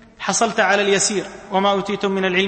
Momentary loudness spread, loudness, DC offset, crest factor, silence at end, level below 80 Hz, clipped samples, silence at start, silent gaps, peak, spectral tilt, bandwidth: 6 LU; -18 LUFS; under 0.1%; 16 dB; 0 s; -54 dBFS; under 0.1%; 0.2 s; none; -2 dBFS; -3 dB/octave; 8.8 kHz